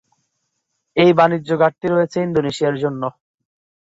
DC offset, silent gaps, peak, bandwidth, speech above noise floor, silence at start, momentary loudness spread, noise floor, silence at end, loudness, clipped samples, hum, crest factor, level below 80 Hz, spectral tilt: under 0.1%; none; -2 dBFS; 8 kHz; 57 dB; 0.95 s; 11 LU; -73 dBFS; 0.8 s; -17 LUFS; under 0.1%; none; 16 dB; -58 dBFS; -6.5 dB/octave